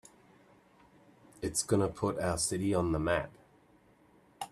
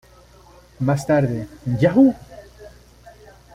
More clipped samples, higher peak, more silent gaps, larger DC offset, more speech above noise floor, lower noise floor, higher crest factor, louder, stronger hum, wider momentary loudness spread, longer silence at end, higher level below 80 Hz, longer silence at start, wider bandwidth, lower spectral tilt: neither; second, -14 dBFS vs -4 dBFS; neither; neither; about the same, 33 dB vs 31 dB; first, -64 dBFS vs -48 dBFS; about the same, 20 dB vs 18 dB; second, -32 LUFS vs -19 LUFS; neither; second, 10 LU vs 15 LU; second, 0.05 s vs 0.85 s; second, -56 dBFS vs -48 dBFS; first, 1.4 s vs 0.8 s; about the same, 14 kHz vs 13.5 kHz; second, -4.5 dB/octave vs -8 dB/octave